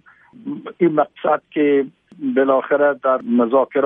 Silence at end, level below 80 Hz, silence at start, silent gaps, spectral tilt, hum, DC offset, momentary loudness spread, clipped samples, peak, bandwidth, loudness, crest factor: 0 s; -72 dBFS; 0.45 s; none; -10 dB/octave; none; under 0.1%; 14 LU; under 0.1%; -2 dBFS; 3.8 kHz; -18 LUFS; 16 dB